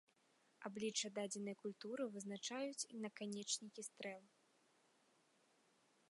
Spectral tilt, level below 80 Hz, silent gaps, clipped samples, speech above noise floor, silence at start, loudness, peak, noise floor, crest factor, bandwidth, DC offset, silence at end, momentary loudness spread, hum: -2.5 dB/octave; under -90 dBFS; none; under 0.1%; 30 dB; 0.6 s; -47 LUFS; -30 dBFS; -78 dBFS; 20 dB; 11.5 kHz; under 0.1%; 1.85 s; 9 LU; none